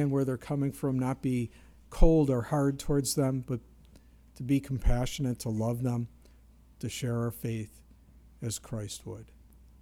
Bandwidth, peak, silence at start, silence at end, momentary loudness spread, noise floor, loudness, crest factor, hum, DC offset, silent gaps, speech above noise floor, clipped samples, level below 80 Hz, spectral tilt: 16.5 kHz; -6 dBFS; 0 s; 0.55 s; 14 LU; -57 dBFS; -31 LUFS; 24 dB; none; under 0.1%; none; 28 dB; under 0.1%; -36 dBFS; -6.5 dB/octave